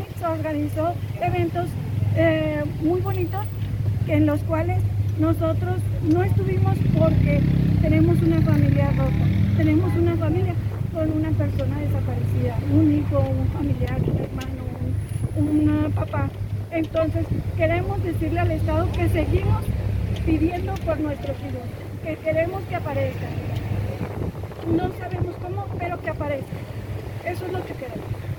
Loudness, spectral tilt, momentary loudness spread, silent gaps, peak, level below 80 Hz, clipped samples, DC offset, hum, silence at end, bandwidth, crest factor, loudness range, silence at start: -23 LUFS; -9 dB/octave; 10 LU; none; -6 dBFS; -34 dBFS; under 0.1%; under 0.1%; none; 0 s; 18.5 kHz; 16 dB; 8 LU; 0 s